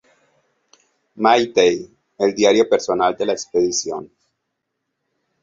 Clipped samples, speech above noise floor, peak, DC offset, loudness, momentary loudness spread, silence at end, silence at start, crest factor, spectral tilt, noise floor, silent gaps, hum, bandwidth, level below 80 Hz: under 0.1%; 59 dB; -2 dBFS; under 0.1%; -18 LUFS; 9 LU; 1.35 s; 1.15 s; 18 dB; -3 dB/octave; -76 dBFS; none; none; 7.8 kHz; -60 dBFS